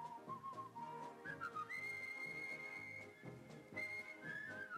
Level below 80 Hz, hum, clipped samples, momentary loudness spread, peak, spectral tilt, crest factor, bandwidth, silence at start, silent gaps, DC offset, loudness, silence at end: -86 dBFS; none; under 0.1%; 7 LU; -36 dBFS; -4.5 dB/octave; 14 dB; 15 kHz; 0 s; none; under 0.1%; -49 LUFS; 0 s